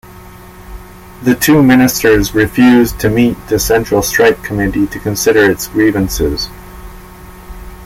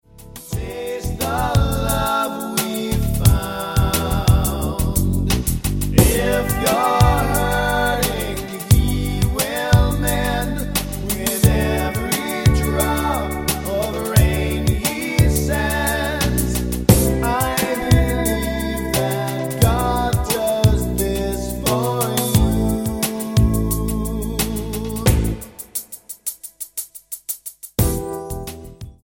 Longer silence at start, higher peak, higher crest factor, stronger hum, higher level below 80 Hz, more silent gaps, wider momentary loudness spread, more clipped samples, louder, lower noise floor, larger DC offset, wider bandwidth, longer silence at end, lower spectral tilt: about the same, 0.05 s vs 0.15 s; about the same, 0 dBFS vs 0 dBFS; second, 12 dB vs 18 dB; neither; about the same, -30 dBFS vs -26 dBFS; neither; second, 8 LU vs 11 LU; neither; first, -11 LUFS vs -19 LUFS; second, -34 dBFS vs -39 dBFS; neither; about the same, 16.5 kHz vs 17 kHz; second, 0 s vs 0.15 s; about the same, -5 dB/octave vs -5 dB/octave